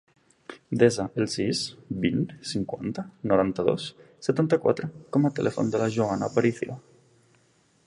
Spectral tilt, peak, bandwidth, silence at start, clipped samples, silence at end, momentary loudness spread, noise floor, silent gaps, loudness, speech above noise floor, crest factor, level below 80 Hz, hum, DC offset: -6 dB/octave; -6 dBFS; 11.5 kHz; 0.5 s; under 0.1%; 1.1 s; 11 LU; -64 dBFS; none; -26 LUFS; 38 dB; 20 dB; -58 dBFS; none; under 0.1%